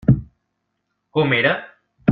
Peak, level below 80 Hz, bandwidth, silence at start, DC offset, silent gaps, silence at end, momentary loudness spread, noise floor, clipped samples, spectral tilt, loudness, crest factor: -2 dBFS; -42 dBFS; 4.5 kHz; 0.1 s; under 0.1%; none; 0 s; 9 LU; -74 dBFS; under 0.1%; -10 dB/octave; -20 LUFS; 20 dB